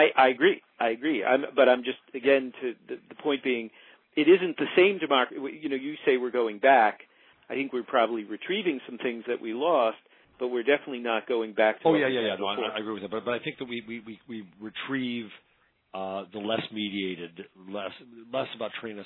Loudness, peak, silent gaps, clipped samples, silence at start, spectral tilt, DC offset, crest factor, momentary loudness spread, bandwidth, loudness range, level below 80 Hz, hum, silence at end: -27 LUFS; -8 dBFS; none; under 0.1%; 0 s; -8.5 dB/octave; under 0.1%; 20 dB; 17 LU; 4.2 kHz; 9 LU; -78 dBFS; none; 0 s